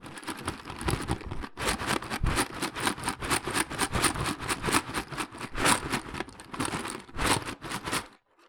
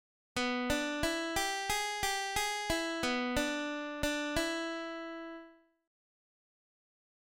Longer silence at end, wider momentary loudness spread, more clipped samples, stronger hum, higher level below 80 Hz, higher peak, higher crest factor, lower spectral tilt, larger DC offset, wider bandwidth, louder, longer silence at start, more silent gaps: second, 0.35 s vs 1.8 s; about the same, 10 LU vs 9 LU; neither; neither; first, -42 dBFS vs -52 dBFS; first, -8 dBFS vs -18 dBFS; first, 24 dB vs 18 dB; about the same, -3 dB/octave vs -2.5 dB/octave; neither; first, over 20 kHz vs 17 kHz; first, -30 LUFS vs -34 LUFS; second, 0 s vs 0.35 s; neither